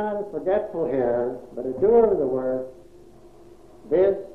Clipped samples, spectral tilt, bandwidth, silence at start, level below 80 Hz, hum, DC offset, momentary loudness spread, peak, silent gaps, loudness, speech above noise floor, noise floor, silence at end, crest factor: under 0.1%; -9 dB/octave; 4.2 kHz; 0 s; -52 dBFS; none; 0.3%; 13 LU; -8 dBFS; none; -23 LUFS; 27 dB; -49 dBFS; 0 s; 16 dB